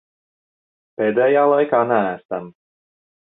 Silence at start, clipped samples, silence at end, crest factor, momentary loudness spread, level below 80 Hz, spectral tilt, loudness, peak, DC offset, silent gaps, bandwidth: 1 s; under 0.1%; 0.75 s; 18 dB; 14 LU; -68 dBFS; -10 dB/octave; -18 LUFS; -4 dBFS; under 0.1%; 2.25-2.29 s; 4 kHz